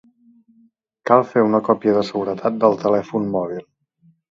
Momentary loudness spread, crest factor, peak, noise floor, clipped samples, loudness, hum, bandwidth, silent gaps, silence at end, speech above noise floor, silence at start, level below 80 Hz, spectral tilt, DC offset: 9 LU; 20 dB; 0 dBFS; -58 dBFS; under 0.1%; -19 LUFS; none; 7.6 kHz; none; 0.7 s; 40 dB; 1.05 s; -62 dBFS; -7.5 dB/octave; under 0.1%